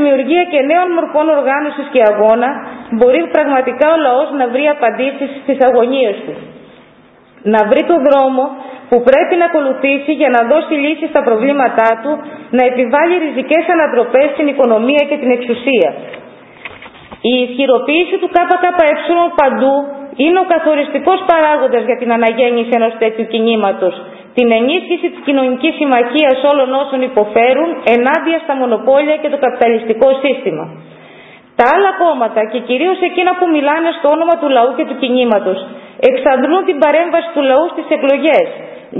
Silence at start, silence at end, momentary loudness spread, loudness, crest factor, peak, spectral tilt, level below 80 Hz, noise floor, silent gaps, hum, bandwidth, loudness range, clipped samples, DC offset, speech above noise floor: 0 s; 0 s; 7 LU; -12 LUFS; 12 dB; 0 dBFS; -7 dB/octave; -56 dBFS; -44 dBFS; none; none; 4 kHz; 2 LU; under 0.1%; under 0.1%; 32 dB